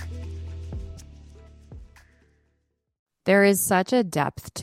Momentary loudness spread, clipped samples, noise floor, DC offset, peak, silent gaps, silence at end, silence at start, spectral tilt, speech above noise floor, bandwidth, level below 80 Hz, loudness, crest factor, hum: 19 LU; under 0.1%; -73 dBFS; under 0.1%; -6 dBFS; 2.99-3.06 s; 0 s; 0 s; -4.5 dB/octave; 52 dB; 16 kHz; -44 dBFS; -22 LUFS; 20 dB; none